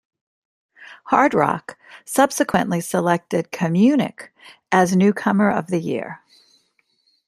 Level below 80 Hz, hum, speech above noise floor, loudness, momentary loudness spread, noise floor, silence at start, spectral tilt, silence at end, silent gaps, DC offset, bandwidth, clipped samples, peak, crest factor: -62 dBFS; none; 46 dB; -19 LUFS; 12 LU; -65 dBFS; 0.8 s; -6 dB/octave; 1.1 s; none; under 0.1%; 14 kHz; under 0.1%; -2 dBFS; 20 dB